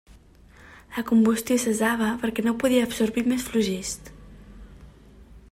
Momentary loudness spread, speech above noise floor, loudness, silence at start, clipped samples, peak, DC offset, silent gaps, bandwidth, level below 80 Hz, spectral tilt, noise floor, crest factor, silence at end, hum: 12 LU; 28 dB; -24 LUFS; 0.7 s; under 0.1%; -10 dBFS; under 0.1%; none; 16 kHz; -50 dBFS; -4.5 dB/octave; -51 dBFS; 16 dB; 0.15 s; none